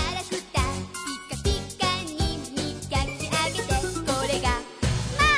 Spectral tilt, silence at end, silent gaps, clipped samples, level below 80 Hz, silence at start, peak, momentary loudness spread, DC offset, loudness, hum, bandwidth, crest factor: -4 dB/octave; 0 s; none; under 0.1%; -34 dBFS; 0 s; -8 dBFS; 6 LU; under 0.1%; -27 LUFS; none; 11 kHz; 18 dB